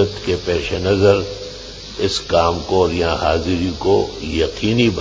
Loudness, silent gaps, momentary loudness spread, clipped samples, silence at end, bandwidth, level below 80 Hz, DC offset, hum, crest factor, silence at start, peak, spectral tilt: -18 LUFS; none; 10 LU; under 0.1%; 0 s; 7.8 kHz; -32 dBFS; under 0.1%; none; 18 dB; 0 s; 0 dBFS; -5.5 dB/octave